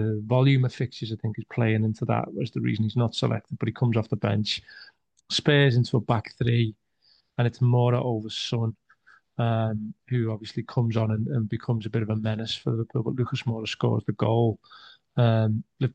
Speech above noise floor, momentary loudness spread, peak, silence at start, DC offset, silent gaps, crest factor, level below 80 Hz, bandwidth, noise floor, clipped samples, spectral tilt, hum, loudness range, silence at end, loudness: 40 dB; 9 LU; -8 dBFS; 0 s; under 0.1%; none; 18 dB; -62 dBFS; 8.6 kHz; -65 dBFS; under 0.1%; -7 dB/octave; none; 3 LU; 0.05 s; -26 LUFS